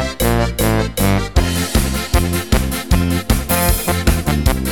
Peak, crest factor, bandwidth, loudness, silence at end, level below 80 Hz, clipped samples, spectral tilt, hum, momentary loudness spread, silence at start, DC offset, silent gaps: 0 dBFS; 16 dB; 19.5 kHz; -17 LUFS; 0 s; -20 dBFS; under 0.1%; -5 dB/octave; none; 2 LU; 0 s; 1%; none